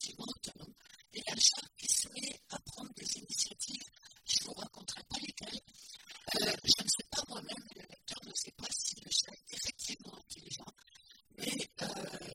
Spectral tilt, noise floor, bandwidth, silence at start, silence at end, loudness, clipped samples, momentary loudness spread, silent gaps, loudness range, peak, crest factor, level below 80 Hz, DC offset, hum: -0.5 dB/octave; -62 dBFS; 16 kHz; 0 s; 0 s; -36 LUFS; under 0.1%; 20 LU; none; 5 LU; -12 dBFS; 28 dB; -68 dBFS; under 0.1%; none